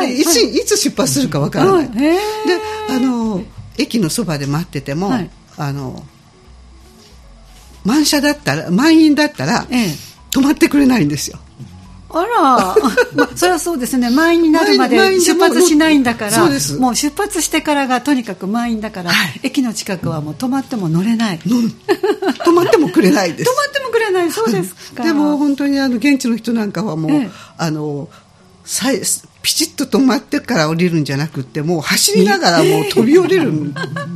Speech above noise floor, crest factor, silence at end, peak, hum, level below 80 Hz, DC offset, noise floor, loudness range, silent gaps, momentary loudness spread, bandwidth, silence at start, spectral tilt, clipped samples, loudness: 28 dB; 14 dB; 0 s; 0 dBFS; none; -46 dBFS; under 0.1%; -42 dBFS; 7 LU; none; 10 LU; 15.5 kHz; 0 s; -4 dB/octave; under 0.1%; -14 LUFS